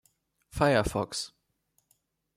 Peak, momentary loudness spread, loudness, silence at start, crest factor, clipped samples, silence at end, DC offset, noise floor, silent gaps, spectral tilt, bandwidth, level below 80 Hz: -10 dBFS; 17 LU; -28 LUFS; 0.55 s; 22 dB; under 0.1%; 1.1 s; under 0.1%; -75 dBFS; none; -5 dB/octave; 16 kHz; -50 dBFS